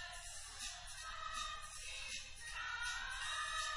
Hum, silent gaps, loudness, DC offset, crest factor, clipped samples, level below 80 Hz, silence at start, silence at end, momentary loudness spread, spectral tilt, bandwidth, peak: none; none; -44 LUFS; under 0.1%; 16 dB; under 0.1%; -58 dBFS; 0 s; 0 s; 7 LU; 1 dB/octave; 11.5 kHz; -30 dBFS